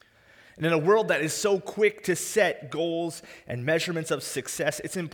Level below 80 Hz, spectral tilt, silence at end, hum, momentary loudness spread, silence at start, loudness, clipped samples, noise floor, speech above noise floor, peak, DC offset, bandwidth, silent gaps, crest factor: -66 dBFS; -4 dB/octave; 0 s; none; 10 LU; 0.55 s; -26 LUFS; under 0.1%; -56 dBFS; 30 dB; -8 dBFS; under 0.1%; over 20 kHz; none; 18 dB